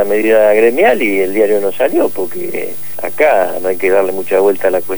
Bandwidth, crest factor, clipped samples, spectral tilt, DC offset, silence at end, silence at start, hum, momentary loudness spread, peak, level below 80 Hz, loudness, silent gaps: over 20 kHz; 12 dB; under 0.1%; -5 dB/octave; 7%; 0 s; 0 s; none; 9 LU; 0 dBFS; -54 dBFS; -12 LUFS; none